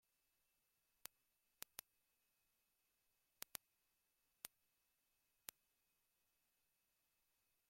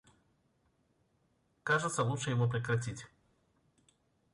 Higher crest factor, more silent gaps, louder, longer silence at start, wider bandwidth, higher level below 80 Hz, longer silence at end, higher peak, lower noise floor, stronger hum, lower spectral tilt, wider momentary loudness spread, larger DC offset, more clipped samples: first, 46 dB vs 18 dB; neither; second, -58 LUFS vs -34 LUFS; first, 4.45 s vs 1.65 s; first, 16.5 kHz vs 11 kHz; second, under -90 dBFS vs -68 dBFS; first, 3.25 s vs 1.25 s; about the same, -20 dBFS vs -20 dBFS; first, -87 dBFS vs -75 dBFS; neither; second, 0.5 dB/octave vs -5 dB/octave; second, 6 LU vs 12 LU; neither; neither